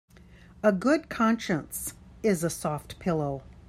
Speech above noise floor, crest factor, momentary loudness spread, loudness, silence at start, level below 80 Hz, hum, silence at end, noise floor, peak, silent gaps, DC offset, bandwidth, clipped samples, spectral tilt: 25 dB; 20 dB; 9 LU; -28 LUFS; 0.3 s; -54 dBFS; none; 0.15 s; -52 dBFS; -10 dBFS; none; under 0.1%; 16 kHz; under 0.1%; -5.5 dB/octave